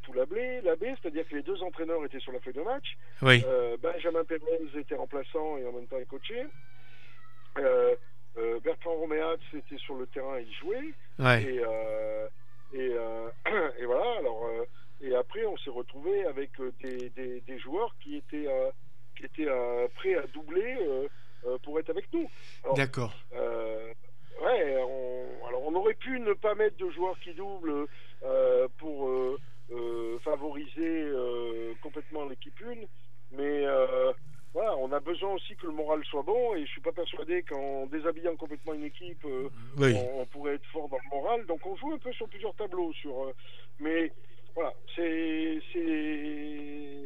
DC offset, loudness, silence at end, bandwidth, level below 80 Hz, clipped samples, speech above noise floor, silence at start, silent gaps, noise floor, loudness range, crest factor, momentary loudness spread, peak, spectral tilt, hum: 2%; -32 LUFS; 0 s; 11.5 kHz; -80 dBFS; under 0.1%; 26 dB; 0.05 s; none; -58 dBFS; 7 LU; 28 dB; 13 LU; -4 dBFS; -6.5 dB/octave; none